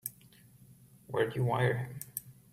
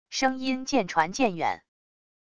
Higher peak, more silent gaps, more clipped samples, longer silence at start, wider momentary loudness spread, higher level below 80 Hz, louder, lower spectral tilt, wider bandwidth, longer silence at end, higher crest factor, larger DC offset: second, -16 dBFS vs -8 dBFS; neither; neither; about the same, 0.05 s vs 0.05 s; first, 13 LU vs 6 LU; about the same, -66 dBFS vs -62 dBFS; second, -34 LUFS vs -26 LUFS; first, -6 dB/octave vs -3.5 dB/octave; first, 16 kHz vs 10 kHz; second, 0.2 s vs 0.7 s; about the same, 20 dB vs 20 dB; second, under 0.1% vs 0.5%